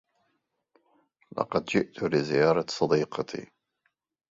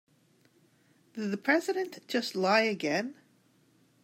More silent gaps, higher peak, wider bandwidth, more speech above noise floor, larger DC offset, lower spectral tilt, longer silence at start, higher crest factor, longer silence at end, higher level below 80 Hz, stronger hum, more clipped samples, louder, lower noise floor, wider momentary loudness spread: neither; first, -8 dBFS vs -12 dBFS; second, 7.8 kHz vs 16 kHz; first, 50 dB vs 37 dB; neither; about the same, -5.5 dB/octave vs -4.5 dB/octave; first, 1.35 s vs 1.15 s; about the same, 22 dB vs 22 dB; about the same, 0.85 s vs 0.9 s; first, -64 dBFS vs -88 dBFS; neither; neither; first, -27 LUFS vs -30 LUFS; first, -77 dBFS vs -66 dBFS; about the same, 12 LU vs 12 LU